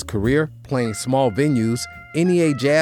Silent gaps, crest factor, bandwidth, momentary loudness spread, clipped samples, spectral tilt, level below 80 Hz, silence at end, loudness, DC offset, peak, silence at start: none; 12 dB; 17.5 kHz; 6 LU; under 0.1%; -6 dB/octave; -44 dBFS; 0 s; -20 LUFS; under 0.1%; -6 dBFS; 0 s